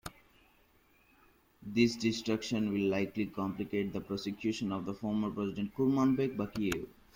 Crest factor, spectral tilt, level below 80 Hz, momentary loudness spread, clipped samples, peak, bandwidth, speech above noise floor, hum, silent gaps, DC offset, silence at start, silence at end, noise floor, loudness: 20 dB; -6 dB/octave; -62 dBFS; 8 LU; under 0.1%; -14 dBFS; 16.5 kHz; 34 dB; none; none; under 0.1%; 0.05 s; 0.25 s; -67 dBFS; -34 LUFS